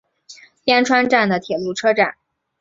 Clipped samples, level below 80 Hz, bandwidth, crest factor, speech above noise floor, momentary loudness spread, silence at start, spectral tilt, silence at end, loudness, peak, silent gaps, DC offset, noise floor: under 0.1%; -62 dBFS; 7.8 kHz; 18 dB; 29 dB; 8 LU; 0.3 s; -4 dB/octave; 0.5 s; -17 LUFS; -2 dBFS; none; under 0.1%; -45 dBFS